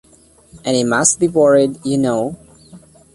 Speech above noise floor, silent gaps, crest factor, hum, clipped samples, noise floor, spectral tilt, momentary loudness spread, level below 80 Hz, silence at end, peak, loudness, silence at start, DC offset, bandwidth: 33 dB; none; 18 dB; none; under 0.1%; -48 dBFS; -4 dB/octave; 10 LU; -52 dBFS; 0.35 s; 0 dBFS; -15 LUFS; 0.55 s; under 0.1%; 11.5 kHz